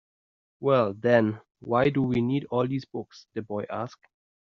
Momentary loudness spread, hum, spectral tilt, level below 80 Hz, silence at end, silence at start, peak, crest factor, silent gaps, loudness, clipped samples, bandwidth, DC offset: 16 LU; none; -6.5 dB/octave; -62 dBFS; 0.65 s; 0.6 s; -8 dBFS; 20 dB; none; -26 LUFS; under 0.1%; 7 kHz; under 0.1%